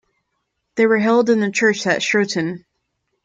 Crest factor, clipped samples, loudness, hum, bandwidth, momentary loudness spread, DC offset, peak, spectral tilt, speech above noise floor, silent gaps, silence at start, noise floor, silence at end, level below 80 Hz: 16 dB; under 0.1%; -17 LUFS; none; 9 kHz; 11 LU; under 0.1%; -4 dBFS; -4.5 dB/octave; 57 dB; none; 0.75 s; -73 dBFS; 0.65 s; -66 dBFS